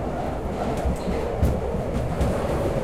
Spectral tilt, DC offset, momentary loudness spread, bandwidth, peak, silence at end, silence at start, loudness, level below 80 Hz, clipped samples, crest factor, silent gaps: -7.5 dB/octave; 0.7%; 4 LU; 15 kHz; -10 dBFS; 0 s; 0 s; -26 LUFS; -30 dBFS; under 0.1%; 14 dB; none